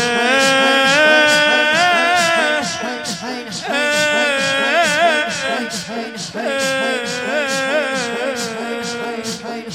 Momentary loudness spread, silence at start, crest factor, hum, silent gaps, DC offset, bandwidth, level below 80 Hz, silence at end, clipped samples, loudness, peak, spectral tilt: 12 LU; 0 s; 16 dB; none; none; under 0.1%; 16 kHz; -62 dBFS; 0 s; under 0.1%; -15 LUFS; 0 dBFS; -2 dB/octave